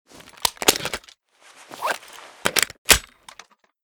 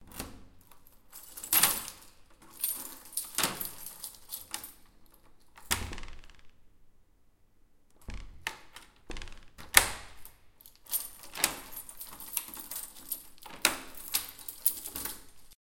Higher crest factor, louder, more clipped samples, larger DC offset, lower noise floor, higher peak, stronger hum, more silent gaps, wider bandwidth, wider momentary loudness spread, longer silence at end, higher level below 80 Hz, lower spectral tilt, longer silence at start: second, 26 dB vs 36 dB; first, -21 LUFS vs -32 LUFS; neither; neither; second, -52 dBFS vs -62 dBFS; about the same, 0 dBFS vs 0 dBFS; neither; first, 2.78-2.85 s vs none; first, over 20 kHz vs 17 kHz; second, 16 LU vs 25 LU; first, 0.8 s vs 0.1 s; first, -44 dBFS vs -52 dBFS; about the same, -0.5 dB/octave vs 0 dB/octave; first, 0.4 s vs 0 s